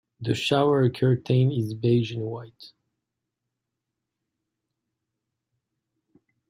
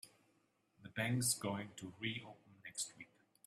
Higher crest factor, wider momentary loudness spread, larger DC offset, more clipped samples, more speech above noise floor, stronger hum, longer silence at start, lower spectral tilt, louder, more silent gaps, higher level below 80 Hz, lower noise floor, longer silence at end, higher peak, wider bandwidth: about the same, 20 dB vs 22 dB; second, 11 LU vs 23 LU; neither; neither; first, 61 dB vs 36 dB; neither; first, 0.2 s vs 0.05 s; first, -7 dB/octave vs -3.5 dB/octave; first, -24 LUFS vs -41 LUFS; neither; first, -64 dBFS vs -78 dBFS; first, -84 dBFS vs -78 dBFS; first, 3.8 s vs 0.4 s; first, -8 dBFS vs -22 dBFS; second, 11.5 kHz vs 15 kHz